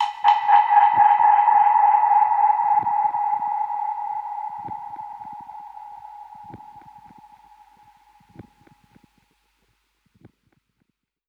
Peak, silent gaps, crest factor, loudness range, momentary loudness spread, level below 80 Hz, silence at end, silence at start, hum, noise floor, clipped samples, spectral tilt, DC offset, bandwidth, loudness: -2 dBFS; none; 18 dB; 24 LU; 24 LU; -68 dBFS; 4.5 s; 0 s; none; -73 dBFS; under 0.1%; -3.5 dB/octave; under 0.1%; 5.8 kHz; -18 LUFS